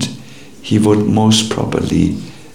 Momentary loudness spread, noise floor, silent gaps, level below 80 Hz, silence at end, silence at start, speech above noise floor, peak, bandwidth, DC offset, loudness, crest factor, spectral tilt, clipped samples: 15 LU; -36 dBFS; none; -40 dBFS; 0.1 s; 0 s; 23 dB; 0 dBFS; 16 kHz; 1%; -14 LUFS; 14 dB; -5.5 dB/octave; under 0.1%